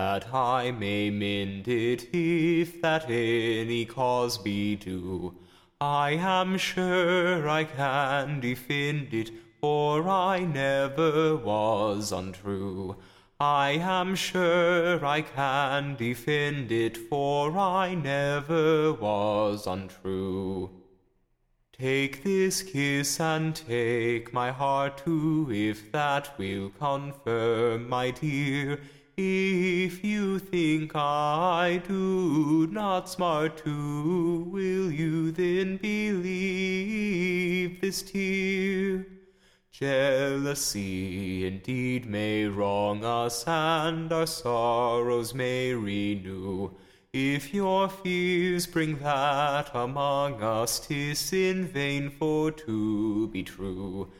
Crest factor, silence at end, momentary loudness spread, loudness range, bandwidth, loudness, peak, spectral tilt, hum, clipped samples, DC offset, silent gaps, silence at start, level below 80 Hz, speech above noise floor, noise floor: 16 dB; 0.1 s; 8 LU; 3 LU; 16 kHz; -28 LUFS; -12 dBFS; -5 dB/octave; none; under 0.1%; under 0.1%; none; 0 s; -56 dBFS; 43 dB; -70 dBFS